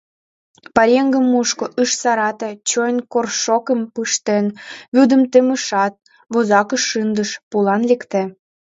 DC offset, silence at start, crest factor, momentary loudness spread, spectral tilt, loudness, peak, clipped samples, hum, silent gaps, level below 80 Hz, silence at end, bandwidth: under 0.1%; 0.75 s; 16 dB; 9 LU; -3.5 dB/octave; -17 LUFS; 0 dBFS; under 0.1%; none; 4.88-4.92 s, 7.43-7.51 s; -60 dBFS; 0.4 s; 8 kHz